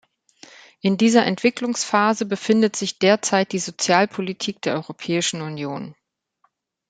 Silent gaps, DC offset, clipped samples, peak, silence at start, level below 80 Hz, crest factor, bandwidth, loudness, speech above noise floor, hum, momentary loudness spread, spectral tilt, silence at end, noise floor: none; under 0.1%; under 0.1%; -2 dBFS; 0.85 s; -68 dBFS; 20 dB; 9.4 kHz; -21 LUFS; 47 dB; none; 11 LU; -4 dB/octave; 1 s; -67 dBFS